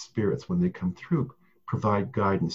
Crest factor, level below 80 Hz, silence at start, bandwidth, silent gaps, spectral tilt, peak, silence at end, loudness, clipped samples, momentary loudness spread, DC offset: 16 dB; -52 dBFS; 0 s; 7.6 kHz; none; -8 dB/octave; -12 dBFS; 0 s; -28 LUFS; under 0.1%; 8 LU; under 0.1%